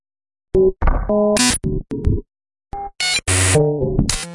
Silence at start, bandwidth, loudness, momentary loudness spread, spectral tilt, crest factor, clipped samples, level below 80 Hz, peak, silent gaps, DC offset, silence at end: 0.55 s; 11.5 kHz; -17 LUFS; 10 LU; -4 dB/octave; 16 dB; under 0.1%; -26 dBFS; -2 dBFS; none; under 0.1%; 0 s